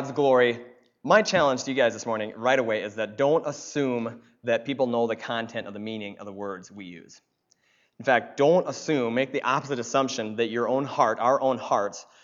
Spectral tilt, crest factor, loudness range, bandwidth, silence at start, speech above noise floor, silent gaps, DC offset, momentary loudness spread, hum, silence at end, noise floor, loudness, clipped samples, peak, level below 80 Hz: -4.5 dB/octave; 20 dB; 6 LU; 7.6 kHz; 0 s; 42 dB; none; under 0.1%; 14 LU; none; 0.2 s; -67 dBFS; -25 LUFS; under 0.1%; -6 dBFS; -72 dBFS